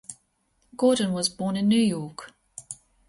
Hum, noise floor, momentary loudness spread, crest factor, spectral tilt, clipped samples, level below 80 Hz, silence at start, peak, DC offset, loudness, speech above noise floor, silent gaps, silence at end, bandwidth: none; -69 dBFS; 21 LU; 18 dB; -5 dB/octave; under 0.1%; -62 dBFS; 0.1 s; -10 dBFS; under 0.1%; -24 LUFS; 46 dB; none; 0.35 s; 11.5 kHz